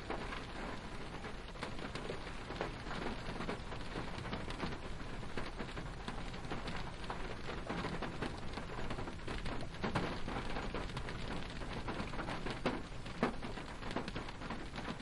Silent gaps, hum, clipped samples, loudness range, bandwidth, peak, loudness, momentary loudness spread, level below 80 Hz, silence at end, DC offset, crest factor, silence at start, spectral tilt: none; none; under 0.1%; 2 LU; 11.5 kHz; -18 dBFS; -43 LUFS; 6 LU; -48 dBFS; 0 s; under 0.1%; 22 dB; 0 s; -5.5 dB/octave